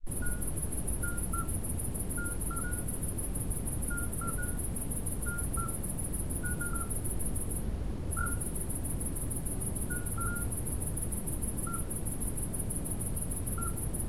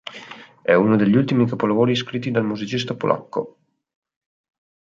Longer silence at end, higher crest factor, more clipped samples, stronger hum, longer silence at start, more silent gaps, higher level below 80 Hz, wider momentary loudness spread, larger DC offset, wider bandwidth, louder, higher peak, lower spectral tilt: second, 0 s vs 1.3 s; second, 14 dB vs 20 dB; neither; neither; about the same, 0 s vs 0.05 s; neither; first, -38 dBFS vs -62 dBFS; second, 2 LU vs 16 LU; first, 0.9% vs under 0.1%; first, 16.5 kHz vs 7.6 kHz; second, -35 LUFS vs -20 LUFS; second, -20 dBFS vs -2 dBFS; second, -5 dB/octave vs -7 dB/octave